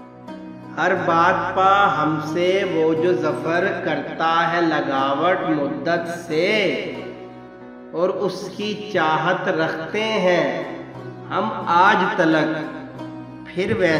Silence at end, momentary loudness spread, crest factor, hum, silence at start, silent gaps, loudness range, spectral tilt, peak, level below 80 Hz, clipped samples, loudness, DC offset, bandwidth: 0 s; 18 LU; 18 dB; none; 0 s; none; 5 LU; -5.5 dB/octave; -4 dBFS; -58 dBFS; under 0.1%; -20 LUFS; under 0.1%; 11 kHz